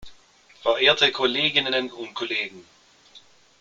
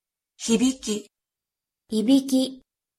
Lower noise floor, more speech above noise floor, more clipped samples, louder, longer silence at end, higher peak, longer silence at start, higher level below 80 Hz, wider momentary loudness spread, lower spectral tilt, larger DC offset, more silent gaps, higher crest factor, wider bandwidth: second, -54 dBFS vs -88 dBFS; second, 31 dB vs 66 dB; neither; first, -21 LUFS vs -24 LUFS; about the same, 0.4 s vs 0.4 s; first, -2 dBFS vs -8 dBFS; second, 0 s vs 0.4 s; about the same, -62 dBFS vs -62 dBFS; first, 14 LU vs 11 LU; about the same, -3 dB/octave vs -4 dB/octave; neither; neither; about the same, 22 dB vs 18 dB; second, 7.8 kHz vs 15 kHz